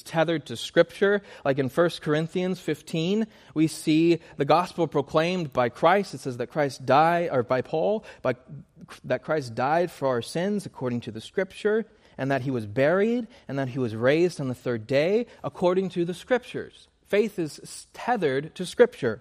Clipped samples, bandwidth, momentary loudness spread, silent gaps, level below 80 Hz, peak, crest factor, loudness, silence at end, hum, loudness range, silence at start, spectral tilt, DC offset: under 0.1%; 15 kHz; 11 LU; none; -64 dBFS; -6 dBFS; 20 dB; -26 LUFS; 0 s; none; 4 LU; 0.05 s; -6 dB/octave; under 0.1%